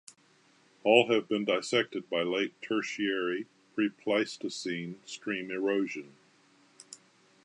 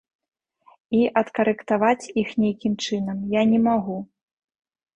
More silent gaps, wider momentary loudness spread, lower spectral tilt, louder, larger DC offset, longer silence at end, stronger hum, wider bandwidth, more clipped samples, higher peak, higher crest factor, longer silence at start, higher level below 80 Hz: neither; first, 16 LU vs 7 LU; second, -4 dB/octave vs -6 dB/octave; second, -30 LUFS vs -22 LUFS; neither; second, 0.5 s vs 0.9 s; neither; first, 11 kHz vs 9 kHz; neither; about the same, -8 dBFS vs -6 dBFS; first, 24 dB vs 18 dB; about the same, 0.85 s vs 0.9 s; second, -84 dBFS vs -60 dBFS